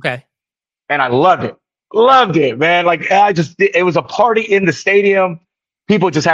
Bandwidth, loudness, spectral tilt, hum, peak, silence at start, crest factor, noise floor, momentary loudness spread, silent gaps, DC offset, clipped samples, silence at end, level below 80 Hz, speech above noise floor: 7.6 kHz; -13 LUFS; -5.5 dB/octave; none; 0 dBFS; 0.05 s; 14 dB; -89 dBFS; 10 LU; none; under 0.1%; under 0.1%; 0 s; -58 dBFS; 77 dB